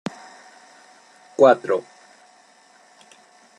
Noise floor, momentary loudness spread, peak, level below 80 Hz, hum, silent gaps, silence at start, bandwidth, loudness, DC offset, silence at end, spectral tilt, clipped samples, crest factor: -54 dBFS; 22 LU; -2 dBFS; -70 dBFS; none; none; 1.4 s; 10.5 kHz; -18 LUFS; under 0.1%; 1.8 s; -5.5 dB/octave; under 0.1%; 22 dB